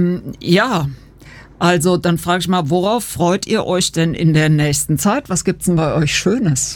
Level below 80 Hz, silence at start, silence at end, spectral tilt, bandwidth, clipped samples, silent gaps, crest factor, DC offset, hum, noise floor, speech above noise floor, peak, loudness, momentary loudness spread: -42 dBFS; 0 s; 0 s; -5 dB/octave; 18 kHz; under 0.1%; none; 14 dB; under 0.1%; none; -40 dBFS; 24 dB; -2 dBFS; -16 LUFS; 4 LU